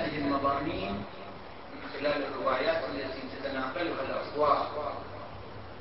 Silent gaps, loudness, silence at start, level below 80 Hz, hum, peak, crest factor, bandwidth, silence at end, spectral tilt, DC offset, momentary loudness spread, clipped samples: none; -32 LUFS; 0 s; -54 dBFS; none; -12 dBFS; 20 dB; 5.8 kHz; 0 s; -9 dB/octave; 0.4%; 16 LU; under 0.1%